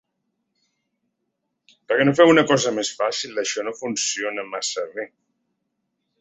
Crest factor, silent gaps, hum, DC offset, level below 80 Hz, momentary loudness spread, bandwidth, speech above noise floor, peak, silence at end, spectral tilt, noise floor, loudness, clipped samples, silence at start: 22 dB; none; none; under 0.1%; -68 dBFS; 14 LU; 8.4 kHz; 56 dB; -2 dBFS; 1.15 s; -3.5 dB/octave; -77 dBFS; -21 LUFS; under 0.1%; 1.9 s